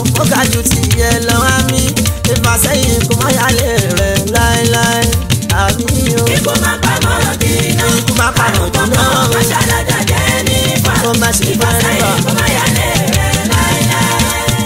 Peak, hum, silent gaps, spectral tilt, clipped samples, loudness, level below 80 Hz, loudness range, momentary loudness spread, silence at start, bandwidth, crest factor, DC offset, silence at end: 0 dBFS; none; none; -4 dB/octave; under 0.1%; -11 LUFS; -24 dBFS; 1 LU; 2 LU; 0 s; 16.5 kHz; 12 dB; under 0.1%; 0 s